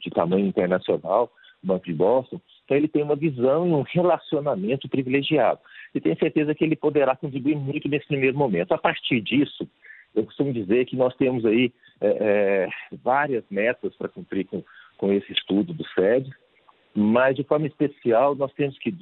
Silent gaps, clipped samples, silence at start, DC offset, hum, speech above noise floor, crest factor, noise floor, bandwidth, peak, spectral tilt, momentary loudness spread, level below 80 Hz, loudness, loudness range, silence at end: none; under 0.1%; 0 s; under 0.1%; none; 36 dB; 18 dB; -59 dBFS; 4.2 kHz; -4 dBFS; -11 dB/octave; 9 LU; -64 dBFS; -23 LUFS; 2 LU; 0 s